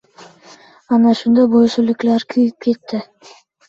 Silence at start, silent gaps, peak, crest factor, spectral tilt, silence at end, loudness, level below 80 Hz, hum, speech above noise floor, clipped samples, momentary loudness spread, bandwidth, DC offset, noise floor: 0.9 s; none; -4 dBFS; 12 dB; -6.5 dB/octave; 0.65 s; -15 LUFS; -60 dBFS; none; 30 dB; under 0.1%; 10 LU; 7.4 kHz; under 0.1%; -45 dBFS